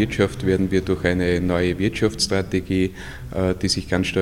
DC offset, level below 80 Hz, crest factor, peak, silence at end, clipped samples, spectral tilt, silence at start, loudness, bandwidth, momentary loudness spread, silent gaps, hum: under 0.1%; -40 dBFS; 18 dB; -4 dBFS; 0 s; under 0.1%; -5.5 dB/octave; 0 s; -21 LUFS; 16 kHz; 4 LU; none; none